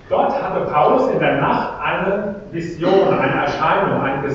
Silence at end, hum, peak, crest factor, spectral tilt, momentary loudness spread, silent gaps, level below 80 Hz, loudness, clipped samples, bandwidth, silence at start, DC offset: 0 s; none; -2 dBFS; 14 dB; -7 dB/octave; 7 LU; none; -46 dBFS; -17 LUFS; under 0.1%; 7.4 kHz; 0.05 s; under 0.1%